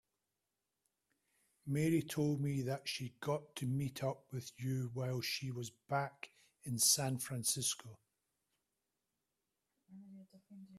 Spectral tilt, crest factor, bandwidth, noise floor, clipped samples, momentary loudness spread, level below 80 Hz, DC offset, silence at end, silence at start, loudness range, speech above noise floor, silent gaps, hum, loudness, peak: -4 dB/octave; 22 dB; 15.5 kHz; -89 dBFS; under 0.1%; 16 LU; -74 dBFS; under 0.1%; 0 s; 1.65 s; 5 LU; 50 dB; none; none; -38 LUFS; -18 dBFS